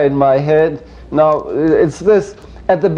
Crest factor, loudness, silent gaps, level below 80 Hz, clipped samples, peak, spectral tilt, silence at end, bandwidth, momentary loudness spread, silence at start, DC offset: 12 dB; -14 LUFS; none; -40 dBFS; under 0.1%; 0 dBFS; -7.5 dB/octave; 0 s; 9.6 kHz; 10 LU; 0 s; under 0.1%